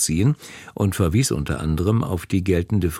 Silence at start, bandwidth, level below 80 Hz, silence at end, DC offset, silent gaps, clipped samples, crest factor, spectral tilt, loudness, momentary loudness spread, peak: 0 s; 16.5 kHz; -36 dBFS; 0 s; under 0.1%; none; under 0.1%; 16 dB; -5.5 dB/octave; -22 LUFS; 5 LU; -6 dBFS